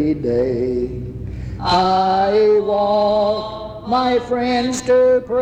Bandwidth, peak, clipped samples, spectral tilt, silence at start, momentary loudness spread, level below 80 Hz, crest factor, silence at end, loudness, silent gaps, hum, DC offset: 9.6 kHz; -6 dBFS; under 0.1%; -5.5 dB/octave; 0 s; 14 LU; -38 dBFS; 12 dB; 0 s; -17 LUFS; none; none; under 0.1%